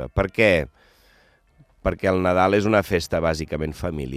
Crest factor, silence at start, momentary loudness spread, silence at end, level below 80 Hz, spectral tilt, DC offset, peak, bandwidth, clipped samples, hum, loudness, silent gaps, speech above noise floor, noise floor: 20 dB; 0 s; 10 LU; 0 s; -40 dBFS; -6 dB/octave; under 0.1%; -4 dBFS; 15.5 kHz; under 0.1%; none; -21 LUFS; none; 37 dB; -58 dBFS